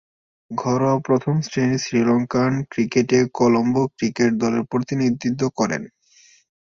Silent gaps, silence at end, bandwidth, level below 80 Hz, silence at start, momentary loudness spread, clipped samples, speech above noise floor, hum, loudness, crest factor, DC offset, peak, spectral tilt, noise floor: none; 0.8 s; 7.4 kHz; -58 dBFS; 0.5 s; 6 LU; under 0.1%; 34 dB; none; -20 LUFS; 16 dB; under 0.1%; -4 dBFS; -6 dB/octave; -54 dBFS